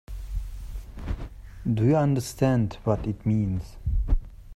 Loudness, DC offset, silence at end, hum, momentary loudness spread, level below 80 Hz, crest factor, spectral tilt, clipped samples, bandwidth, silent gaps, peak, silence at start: -27 LUFS; under 0.1%; 0 s; none; 17 LU; -32 dBFS; 18 dB; -8 dB/octave; under 0.1%; 15 kHz; none; -8 dBFS; 0.1 s